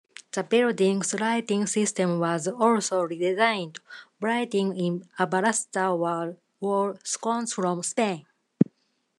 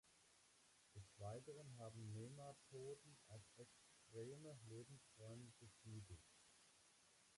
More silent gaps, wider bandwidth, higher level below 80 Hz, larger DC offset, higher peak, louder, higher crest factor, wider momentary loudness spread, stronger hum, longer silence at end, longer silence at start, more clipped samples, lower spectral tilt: neither; about the same, 12.5 kHz vs 11.5 kHz; about the same, -80 dBFS vs -80 dBFS; neither; first, -4 dBFS vs -44 dBFS; first, -26 LUFS vs -60 LUFS; first, 22 dB vs 16 dB; about the same, 9 LU vs 10 LU; neither; first, 0.55 s vs 0 s; first, 0.35 s vs 0.05 s; neither; about the same, -4.5 dB/octave vs -5.5 dB/octave